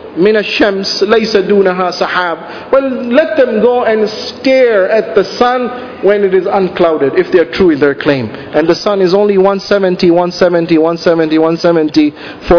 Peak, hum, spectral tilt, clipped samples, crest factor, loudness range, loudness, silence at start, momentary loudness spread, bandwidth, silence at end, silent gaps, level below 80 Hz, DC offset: 0 dBFS; none; -6 dB/octave; 0.9%; 10 dB; 1 LU; -11 LUFS; 0 s; 5 LU; 5.4 kHz; 0 s; none; -40 dBFS; under 0.1%